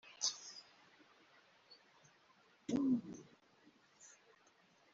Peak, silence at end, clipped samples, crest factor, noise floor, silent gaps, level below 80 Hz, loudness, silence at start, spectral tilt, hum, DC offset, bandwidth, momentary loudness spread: -22 dBFS; 0.85 s; under 0.1%; 24 dB; -71 dBFS; none; -82 dBFS; -41 LUFS; 0.05 s; -4 dB/octave; none; under 0.1%; 7.6 kHz; 27 LU